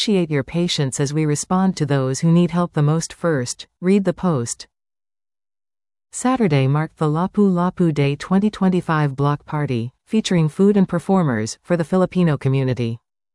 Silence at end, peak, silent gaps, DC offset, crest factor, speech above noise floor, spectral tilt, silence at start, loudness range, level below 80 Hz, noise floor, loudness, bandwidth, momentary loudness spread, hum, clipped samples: 0.4 s; -6 dBFS; none; under 0.1%; 14 dB; over 72 dB; -6 dB/octave; 0 s; 4 LU; -52 dBFS; under -90 dBFS; -19 LUFS; 12 kHz; 7 LU; none; under 0.1%